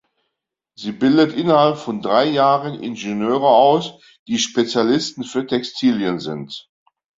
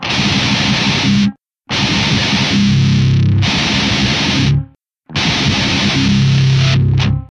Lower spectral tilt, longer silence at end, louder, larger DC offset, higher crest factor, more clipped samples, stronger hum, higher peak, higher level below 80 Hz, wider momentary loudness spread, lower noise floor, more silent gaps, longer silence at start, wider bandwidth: about the same, -5 dB/octave vs -5 dB/octave; first, 0.6 s vs 0.05 s; second, -18 LUFS vs -13 LUFS; neither; about the same, 16 dB vs 12 dB; neither; neither; about the same, -2 dBFS vs 0 dBFS; second, -62 dBFS vs -32 dBFS; first, 14 LU vs 4 LU; first, -79 dBFS vs -39 dBFS; first, 4.19-4.26 s vs none; first, 0.8 s vs 0 s; second, 7.8 kHz vs 10 kHz